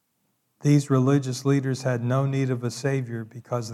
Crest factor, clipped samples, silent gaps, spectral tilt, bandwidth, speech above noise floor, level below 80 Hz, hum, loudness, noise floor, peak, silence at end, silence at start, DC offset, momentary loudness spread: 16 dB; under 0.1%; none; -7 dB/octave; 13 kHz; 49 dB; -74 dBFS; none; -24 LUFS; -73 dBFS; -8 dBFS; 0 s; 0.6 s; under 0.1%; 10 LU